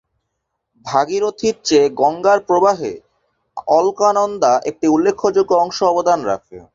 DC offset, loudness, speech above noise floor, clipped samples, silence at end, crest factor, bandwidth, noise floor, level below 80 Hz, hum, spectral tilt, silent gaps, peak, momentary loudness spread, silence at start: under 0.1%; -16 LUFS; 59 dB; under 0.1%; 0.15 s; 16 dB; 7.8 kHz; -75 dBFS; -58 dBFS; none; -4.5 dB/octave; none; -2 dBFS; 10 LU; 0.85 s